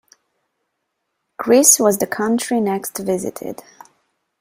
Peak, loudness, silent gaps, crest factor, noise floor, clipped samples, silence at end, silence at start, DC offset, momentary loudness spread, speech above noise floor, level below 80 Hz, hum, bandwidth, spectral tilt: 0 dBFS; -16 LUFS; none; 20 dB; -75 dBFS; under 0.1%; 0.85 s; 1.4 s; under 0.1%; 19 LU; 58 dB; -62 dBFS; none; 16 kHz; -3 dB/octave